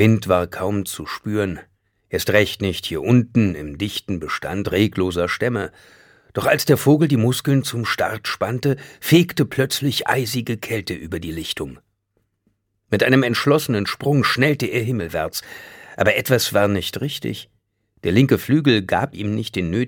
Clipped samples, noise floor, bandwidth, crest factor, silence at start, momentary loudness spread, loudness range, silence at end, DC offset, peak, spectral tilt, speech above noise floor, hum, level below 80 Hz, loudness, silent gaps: under 0.1%; -70 dBFS; 17.5 kHz; 18 dB; 0 s; 11 LU; 3 LU; 0 s; under 0.1%; -2 dBFS; -5.5 dB/octave; 50 dB; none; -48 dBFS; -20 LUFS; none